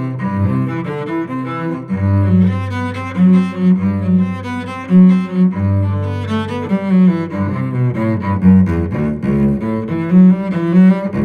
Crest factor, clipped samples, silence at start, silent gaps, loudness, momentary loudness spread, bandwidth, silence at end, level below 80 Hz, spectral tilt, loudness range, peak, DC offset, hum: 12 dB; under 0.1%; 0 s; none; -15 LUFS; 10 LU; 4.8 kHz; 0 s; -40 dBFS; -9.5 dB/octave; 2 LU; -2 dBFS; under 0.1%; none